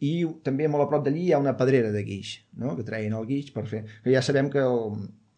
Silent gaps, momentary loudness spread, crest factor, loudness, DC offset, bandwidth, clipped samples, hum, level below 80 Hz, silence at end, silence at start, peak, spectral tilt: none; 11 LU; 16 dB; -26 LUFS; under 0.1%; 9.8 kHz; under 0.1%; none; -70 dBFS; 0.25 s; 0 s; -10 dBFS; -7 dB/octave